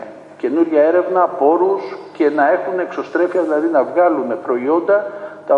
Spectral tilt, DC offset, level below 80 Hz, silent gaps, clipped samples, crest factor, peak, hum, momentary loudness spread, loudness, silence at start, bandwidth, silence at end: -7 dB/octave; under 0.1%; -70 dBFS; none; under 0.1%; 14 dB; -2 dBFS; none; 9 LU; -16 LUFS; 0 s; 7 kHz; 0 s